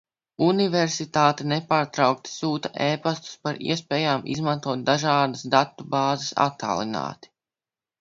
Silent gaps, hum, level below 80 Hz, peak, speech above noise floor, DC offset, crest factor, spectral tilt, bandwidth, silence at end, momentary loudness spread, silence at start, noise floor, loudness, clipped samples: none; none; -64 dBFS; -2 dBFS; over 66 dB; under 0.1%; 22 dB; -5 dB/octave; 7.8 kHz; 0.85 s; 7 LU; 0.4 s; under -90 dBFS; -24 LUFS; under 0.1%